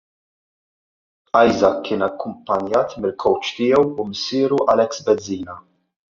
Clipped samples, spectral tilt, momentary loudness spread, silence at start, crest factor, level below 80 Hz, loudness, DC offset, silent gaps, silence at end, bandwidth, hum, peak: under 0.1%; -4 dB/octave; 11 LU; 1.35 s; 18 dB; -58 dBFS; -19 LUFS; under 0.1%; none; 0.6 s; 7.4 kHz; none; -2 dBFS